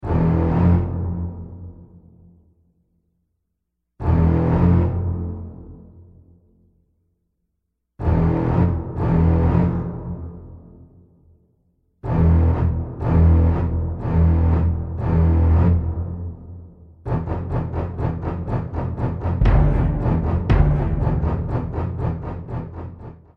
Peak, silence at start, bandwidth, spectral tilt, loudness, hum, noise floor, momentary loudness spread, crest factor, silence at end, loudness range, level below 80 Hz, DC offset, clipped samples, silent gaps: -2 dBFS; 0 s; 3.5 kHz; -11 dB/octave; -20 LUFS; none; -76 dBFS; 17 LU; 18 dB; 0.25 s; 8 LU; -26 dBFS; under 0.1%; under 0.1%; none